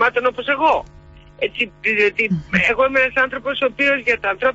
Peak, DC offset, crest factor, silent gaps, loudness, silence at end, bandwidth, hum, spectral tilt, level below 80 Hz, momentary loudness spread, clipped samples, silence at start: -4 dBFS; under 0.1%; 16 dB; none; -17 LUFS; 0 s; 8 kHz; none; -5.5 dB/octave; -46 dBFS; 6 LU; under 0.1%; 0 s